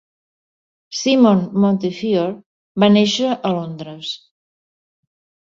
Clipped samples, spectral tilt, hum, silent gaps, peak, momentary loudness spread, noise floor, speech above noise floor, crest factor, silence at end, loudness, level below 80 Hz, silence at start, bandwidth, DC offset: under 0.1%; -5.5 dB/octave; none; 2.46-2.75 s; -2 dBFS; 16 LU; under -90 dBFS; over 74 dB; 16 dB; 1.25 s; -17 LUFS; -62 dBFS; 0.9 s; 7.6 kHz; under 0.1%